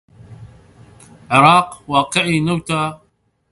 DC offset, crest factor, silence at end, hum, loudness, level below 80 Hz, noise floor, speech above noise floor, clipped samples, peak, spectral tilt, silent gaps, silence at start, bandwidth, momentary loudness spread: under 0.1%; 18 dB; 0.55 s; none; -15 LUFS; -52 dBFS; -61 dBFS; 46 dB; under 0.1%; 0 dBFS; -5 dB/octave; none; 0.3 s; 11.5 kHz; 10 LU